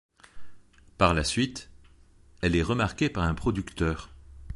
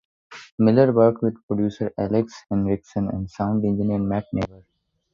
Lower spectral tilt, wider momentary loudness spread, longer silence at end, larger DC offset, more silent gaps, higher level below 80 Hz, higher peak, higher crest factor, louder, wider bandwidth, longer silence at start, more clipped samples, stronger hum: second, -5.5 dB/octave vs -9 dB/octave; about the same, 9 LU vs 11 LU; second, 0 s vs 0.65 s; neither; second, none vs 0.52-0.58 s, 1.43-1.48 s; first, -40 dBFS vs -48 dBFS; about the same, -6 dBFS vs -4 dBFS; about the same, 22 dB vs 18 dB; second, -27 LUFS vs -22 LUFS; first, 11.5 kHz vs 7.2 kHz; about the same, 0.35 s vs 0.3 s; neither; neither